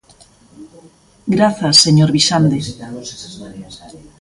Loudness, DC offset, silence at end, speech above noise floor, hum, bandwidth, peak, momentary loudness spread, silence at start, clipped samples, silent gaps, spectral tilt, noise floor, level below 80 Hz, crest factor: -12 LUFS; under 0.1%; 0.25 s; 32 dB; none; 11.5 kHz; 0 dBFS; 24 LU; 0.6 s; under 0.1%; none; -4.5 dB/octave; -48 dBFS; -48 dBFS; 16 dB